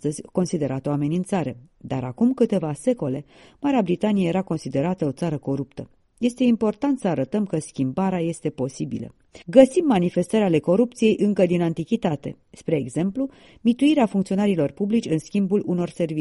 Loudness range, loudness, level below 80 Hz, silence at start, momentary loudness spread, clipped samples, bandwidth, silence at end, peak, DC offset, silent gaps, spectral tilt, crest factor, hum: 4 LU; -23 LUFS; -56 dBFS; 0.05 s; 10 LU; under 0.1%; 11.5 kHz; 0 s; 0 dBFS; under 0.1%; none; -7 dB/octave; 22 dB; none